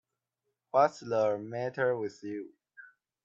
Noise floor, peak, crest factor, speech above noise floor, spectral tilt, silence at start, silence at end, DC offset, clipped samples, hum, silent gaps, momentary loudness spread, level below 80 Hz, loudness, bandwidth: -85 dBFS; -12 dBFS; 20 dB; 54 dB; -6 dB/octave; 0.75 s; 0.4 s; under 0.1%; under 0.1%; none; none; 14 LU; -80 dBFS; -31 LUFS; 7.8 kHz